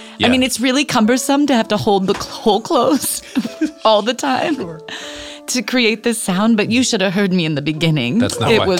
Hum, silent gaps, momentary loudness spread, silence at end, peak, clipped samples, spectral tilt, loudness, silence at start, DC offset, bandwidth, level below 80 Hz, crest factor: none; none; 8 LU; 0 s; 0 dBFS; under 0.1%; -4 dB/octave; -16 LUFS; 0 s; under 0.1%; 17 kHz; -50 dBFS; 16 dB